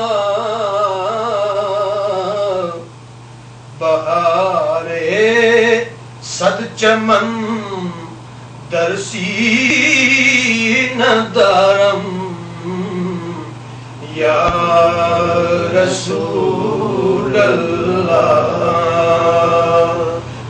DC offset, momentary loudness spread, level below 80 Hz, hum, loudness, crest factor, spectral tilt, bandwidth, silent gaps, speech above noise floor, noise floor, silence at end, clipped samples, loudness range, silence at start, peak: under 0.1%; 14 LU; -46 dBFS; none; -14 LUFS; 14 dB; -4.5 dB/octave; 9.6 kHz; none; 22 dB; -35 dBFS; 0 s; under 0.1%; 6 LU; 0 s; 0 dBFS